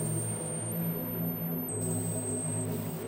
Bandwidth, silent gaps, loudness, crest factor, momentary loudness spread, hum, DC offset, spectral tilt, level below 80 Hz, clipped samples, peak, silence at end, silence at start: 16 kHz; none; -33 LUFS; 12 dB; 2 LU; none; under 0.1%; -5.5 dB/octave; -62 dBFS; under 0.1%; -20 dBFS; 0 s; 0 s